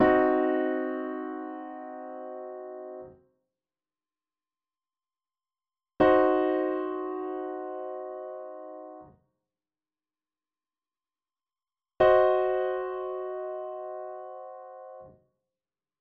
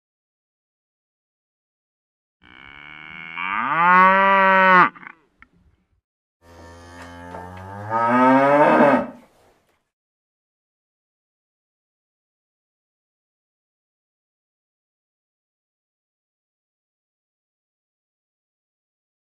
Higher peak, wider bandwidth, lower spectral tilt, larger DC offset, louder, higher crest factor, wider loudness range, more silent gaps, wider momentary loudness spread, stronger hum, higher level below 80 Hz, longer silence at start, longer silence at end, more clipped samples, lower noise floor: second, -10 dBFS vs -2 dBFS; second, 4.9 kHz vs 11 kHz; second, -4.5 dB/octave vs -6.5 dB/octave; neither; second, -28 LUFS vs -15 LUFS; about the same, 20 dB vs 22 dB; first, 17 LU vs 10 LU; second, none vs 6.04-6.40 s; second, 21 LU vs 24 LU; neither; about the same, -62 dBFS vs -64 dBFS; second, 0 s vs 3 s; second, 0.9 s vs 10.2 s; neither; first, under -90 dBFS vs -61 dBFS